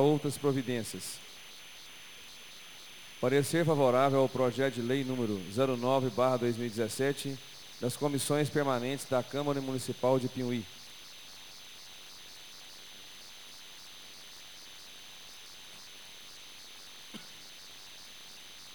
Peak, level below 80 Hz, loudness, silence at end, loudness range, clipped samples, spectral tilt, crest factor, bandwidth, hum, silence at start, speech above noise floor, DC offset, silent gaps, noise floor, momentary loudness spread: -14 dBFS; -70 dBFS; -31 LUFS; 0 s; 18 LU; under 0.1%; -5 dB/octave; 20 dB; over 20 kHz; none; 0 s; 20 dB; 0.2%; none; -50 dBFS; 19 LU